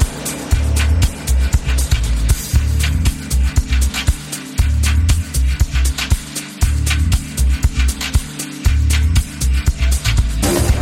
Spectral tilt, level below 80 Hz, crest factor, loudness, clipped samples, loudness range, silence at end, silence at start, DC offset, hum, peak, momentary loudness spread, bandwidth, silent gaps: -4.5 dB/octave; -16 dBFS; 14 dB; -17 LUFS; under 0.1%; 1 LU; 0 s; 0 s; under 0.1%; none; 0 dBFS; 4 LU; 16.5 kHz; none